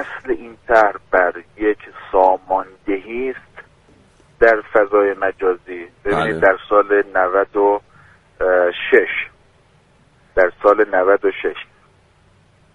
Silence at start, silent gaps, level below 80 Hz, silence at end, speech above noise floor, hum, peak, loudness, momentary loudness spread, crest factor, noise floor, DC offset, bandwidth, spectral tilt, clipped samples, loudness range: 0 s; none; -46 dBFS; 1.1 s; 37 dB; none; 0 dBFS; -17 LUFS; 11 LU; 18 dB; -53 dBFS; under 0.1%; 10 kHz; -6 dB/octave; under 0.1%; 3 LU